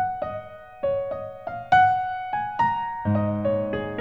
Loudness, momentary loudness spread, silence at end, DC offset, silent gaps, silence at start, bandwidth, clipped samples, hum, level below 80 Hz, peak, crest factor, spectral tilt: -24 LUFS; 15 LU; 0 s; 0.2%; none; 0 s; 7.6 kHz; under 0.1%; none; -52 dBFS; -6 dBFS; 20 dB; -8 dB/octave